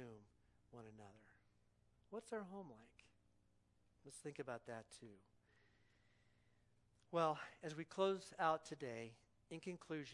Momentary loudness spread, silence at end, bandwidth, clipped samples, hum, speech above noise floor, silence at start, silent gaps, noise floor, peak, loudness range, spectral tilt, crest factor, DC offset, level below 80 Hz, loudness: 22 LU; 0 s; 11 kHz; under 0.1%; 60 Hz at -80 dBFS; 31 dB; 0 s; none; -78 dBFS; -26 dBFS; 13 LU; -5 dB/octave; 24 dB; under 0.1%; -84 dBFS; -47 LUFS